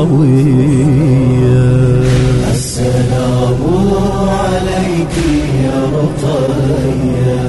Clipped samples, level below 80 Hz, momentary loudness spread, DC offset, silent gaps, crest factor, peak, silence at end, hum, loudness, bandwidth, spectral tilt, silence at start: under 0.1%; -24 dBFS; 5 LU; 0.8%; none; 8 dB; -2 dBFS; 0 s; none; -12 LUFS; 12 kHz; -7 dB/octave; 0 s